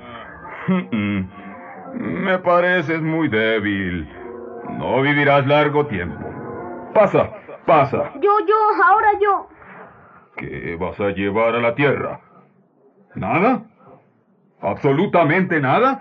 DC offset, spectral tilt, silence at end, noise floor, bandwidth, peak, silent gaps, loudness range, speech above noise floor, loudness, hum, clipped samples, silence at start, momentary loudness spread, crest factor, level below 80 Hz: under 0.1%; -8.5 dB/octave; 0 s; -58 dBFS; 6.6 kHz; -4 dBFS; none; 6 LU; 40 dB; -18 LUFS; none; under 0.1%; 0 s; 18 LU; 16 dB; -54 dBFS